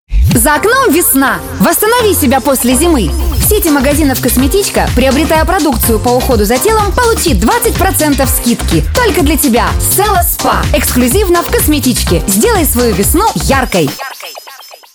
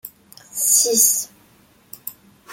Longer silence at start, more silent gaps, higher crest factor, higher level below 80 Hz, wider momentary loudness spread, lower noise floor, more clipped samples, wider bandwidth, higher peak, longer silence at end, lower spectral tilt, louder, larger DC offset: about the same, 0.1 s vs 0.05 s; neither; second, 10 dB vs 20 dB; first, -18 dBFS vs -68 dBFS; second, 4 LU vs 22 LU; second, -32 dBFS vs -54 dBFS; neither; first, over 20 kHz vs 17 kHz; about the same, 0 dBFS vs -2 dBFS; first, 0.2 s vs 0 s; first, -4 dB/octave vs 0 dB/octave; first, -9 LUFS vs -15 LUFS; neither